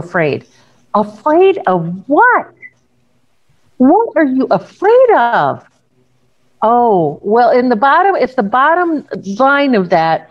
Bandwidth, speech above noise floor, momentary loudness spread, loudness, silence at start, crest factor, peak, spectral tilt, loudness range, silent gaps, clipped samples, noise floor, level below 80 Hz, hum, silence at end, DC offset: 7.4 kHz; 49 dB; 8 LU; -12 LUFS; 0 s; 12 dB; 0 dBFS; -7.5 dB/octave; 2 LU; none; under 0.1%; -60 dBFS; -60 dBFS; none; 0.1 s; 0.1%